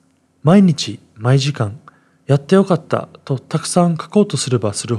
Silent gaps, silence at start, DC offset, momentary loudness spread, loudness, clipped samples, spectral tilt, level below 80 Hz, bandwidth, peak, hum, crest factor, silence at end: none; 0.45 s; under 0.1%; 12 LU; -16 LUFS; under 0.1%; -6 dB/octave; -64 dBFS; 12 kHz; 0 dBFS; none; 16 dB; 0 s